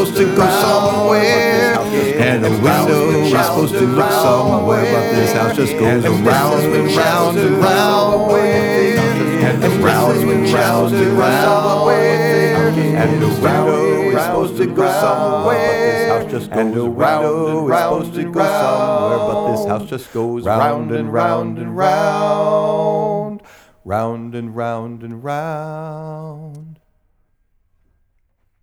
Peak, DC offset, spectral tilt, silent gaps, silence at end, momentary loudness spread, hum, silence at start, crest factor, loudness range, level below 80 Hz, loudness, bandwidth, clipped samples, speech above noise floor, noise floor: 0 dBFS; under 0.1%; -5.5 dB/octave; none; 1.9 s; 10 LU; none; 0 s; 14 dB; 10 LU; -50 dBFS; -14 LUFS; over 20 kHz; under 0.1%; 47 dB; -62 dBFS